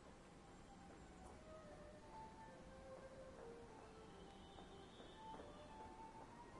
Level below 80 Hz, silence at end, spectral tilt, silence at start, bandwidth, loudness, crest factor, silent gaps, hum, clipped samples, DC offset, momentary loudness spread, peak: -70 dBFS; 0 s; -5 dB/octave; 0 s; 11 kHz; -60 LUFS; 18 dB; none; none; under 0.1%; under 0.1%; 4 LU; -42 dBFS